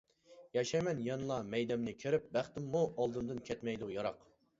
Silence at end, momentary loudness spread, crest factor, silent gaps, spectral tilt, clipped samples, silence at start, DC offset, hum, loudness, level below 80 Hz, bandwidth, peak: 0.45 s; 6 LU; 18 dB; none; -5.5 dB/octave; under 0.1%; 0.3 s; under 0.1%; none; -38 LUFS; -68 dBFS; 7.6 kHz; -20 dBFS